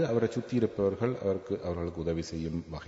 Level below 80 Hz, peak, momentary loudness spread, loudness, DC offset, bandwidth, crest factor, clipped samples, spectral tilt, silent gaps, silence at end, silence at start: -52 dBFS; -14 dBFS; 6 LU; -32 LUFS; under 0.1%; 7.8 kHz; 18 dB; under 0.1%; -7.5 dB/octave; none; 0 s; 0 s